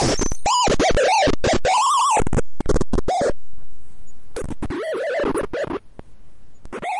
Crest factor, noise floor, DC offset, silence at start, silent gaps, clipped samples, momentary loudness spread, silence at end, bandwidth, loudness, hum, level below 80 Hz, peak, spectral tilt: 10 dB; -44 dBFS; under 0.1%; 0 s; none; under 0.1%; 14 LU; 0 s; 11.5 kHz; -20 LUFS; none; -32 dBFS; -10 dBFS; -4 dB/octave